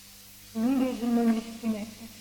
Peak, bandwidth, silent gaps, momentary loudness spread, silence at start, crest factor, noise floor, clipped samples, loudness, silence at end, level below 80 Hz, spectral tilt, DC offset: -16 dBFS; 19 kHz; none; 17 LU; 0 s; 14 dB; -50 dBFS; under 0.1%; -29 LUFS; 0 s; -60 dBFS; -5.5 dB/octave; under 0.1%